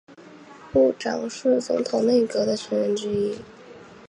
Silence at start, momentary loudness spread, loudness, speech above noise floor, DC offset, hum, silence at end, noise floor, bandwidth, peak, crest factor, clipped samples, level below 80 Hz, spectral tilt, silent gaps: 0.1 s; 8 LU; -23 LUFS; 23 dB; under 0.1%; none; 0.15 s; -45 dBFS; 11 kHz; -8 dBFS; 16 dB; under 0.1%; -58 dBFS; -5 dB/octave; none